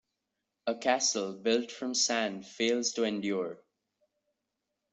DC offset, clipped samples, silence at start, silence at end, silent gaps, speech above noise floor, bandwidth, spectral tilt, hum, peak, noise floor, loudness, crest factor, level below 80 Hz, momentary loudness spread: under 0.1%; under 0.1%; 0.65 s; 1.35 s; none; 54 dB; 8.2 kHz; -2 dB/octave; none; -12 dBFS; -85 dBFS; -31 LUFS; 20 dB; -78 dBFS; 8 LU